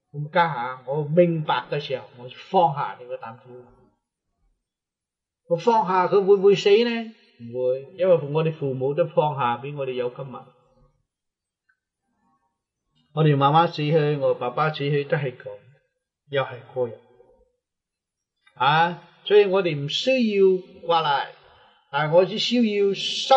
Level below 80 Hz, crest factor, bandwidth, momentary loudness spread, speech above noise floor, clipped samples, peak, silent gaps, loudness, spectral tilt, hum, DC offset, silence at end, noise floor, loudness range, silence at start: -74 dBFS; 20 dB; 8.2 kHz; 14 LU; 66 dB; under 0.1%; -4 dBFS; none; -22 LUFS; -6 dB/octave; none; under 0.1%; 0 s; -87 dBFS; 9 LU; 0.15 s